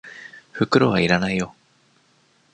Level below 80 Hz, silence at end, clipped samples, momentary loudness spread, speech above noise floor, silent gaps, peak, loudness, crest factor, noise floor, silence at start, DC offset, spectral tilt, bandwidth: -52 dBFS; 1.05 s; under 0.1%; 21 LU; 41 dB; none; -2 dBFS; -20 LUFS; 20 dB; -60 dBFS; 0.05 s; under 0.1%; -6 dB/octave; 9.2 kHz